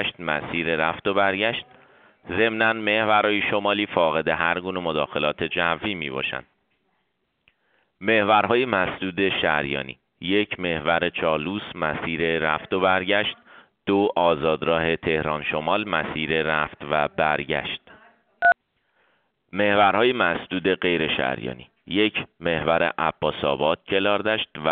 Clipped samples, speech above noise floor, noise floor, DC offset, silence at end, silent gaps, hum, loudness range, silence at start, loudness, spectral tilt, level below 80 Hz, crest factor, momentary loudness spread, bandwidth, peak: under 0.1%; 50 dB; -73 dBFS; under 0.1%; 0 s; none; none; 3 LU; 0 s; -23 LUFS; -2 dB/octave; -54 dBFS; 20 dB; 8 LU; 4.7 kHz; -4 dBFS